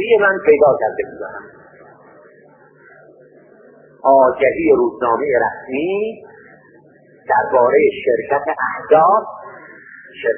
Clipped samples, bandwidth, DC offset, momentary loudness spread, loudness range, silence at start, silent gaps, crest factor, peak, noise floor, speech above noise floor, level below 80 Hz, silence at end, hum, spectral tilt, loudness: under 0.1%; 3.4 kHz; under 0.1%; 19 LU; 5 LU; 0 s; none; 16 dB; 0 dBFS; -48 dBFS; 33 dB; -56 dBFS; 0 s; none; -10.5 dB/octave; -15 LUFS